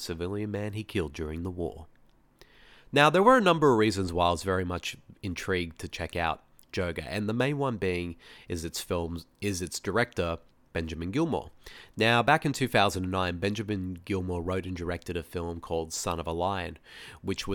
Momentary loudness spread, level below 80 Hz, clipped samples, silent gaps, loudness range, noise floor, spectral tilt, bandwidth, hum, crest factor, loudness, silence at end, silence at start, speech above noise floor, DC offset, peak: 15 LU; -50 dBFS; under 0.1%; none; 8 LU; -59 dBFS; -5 dB/octave; 19 kHz; none; 24 dB; -29 LUFS; 0 s; 0 s; 30 dB; under 0.1%; -6 dBFS